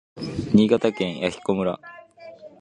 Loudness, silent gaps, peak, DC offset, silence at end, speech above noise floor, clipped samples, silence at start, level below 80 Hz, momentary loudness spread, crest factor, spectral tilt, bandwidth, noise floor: -22 LUFS; none; -4 dBFS; under 0.1%; 0.15 s; 22 dB; under 0.1%; 0.15 s; -52 dBFS; 25 LU; 20 dB; -7 dB/octave; 9.8 kHz; -44 dBFS